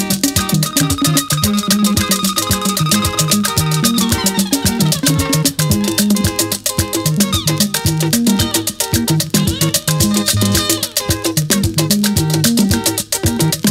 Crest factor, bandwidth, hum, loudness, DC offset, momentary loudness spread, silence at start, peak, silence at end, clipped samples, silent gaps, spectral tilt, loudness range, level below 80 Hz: 14 dB; 16.5 kHz; none; -14 LUFS; under 0.1%; 3 LU; 0 s; 0 dBFS; 0 s; under 0.1%; none; -3.5 dB/octave; 1 LU; -34 dBFS